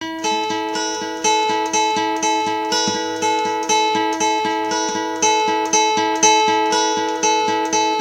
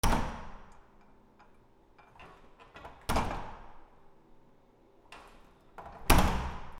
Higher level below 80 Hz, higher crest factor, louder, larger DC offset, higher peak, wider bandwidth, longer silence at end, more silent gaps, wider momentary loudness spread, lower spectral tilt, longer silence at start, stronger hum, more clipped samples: second, -60 dBFS vs -38 dBFS; second, 18 dB vs 30 dB; first, -18 LUFS vs -32 LUFS; neither; first, 0 dBFS vs -4 dBFS; about the same, 16.5 kHz vs 17.5 kHz; about the same, 0 s vs 0 s; neither; second, 6 LU vs 28 LU; second, -1 dB/octave vs -4.5 dB/octave; about the same, 0 s vs 0.05 s; neither; neither